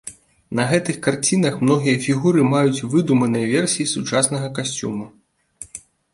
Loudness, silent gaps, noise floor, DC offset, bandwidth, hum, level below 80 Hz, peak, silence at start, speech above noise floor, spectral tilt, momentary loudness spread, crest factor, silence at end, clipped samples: -19 LUFS; none; -43 dBFS; under 0.1%; 11.5 kHz; none; -58 dBFS; -2 dBFS; 0.05 s; 24 dB; -5 dB/octave; 18 LU; 18 dB; 0.35 s; under 0.1%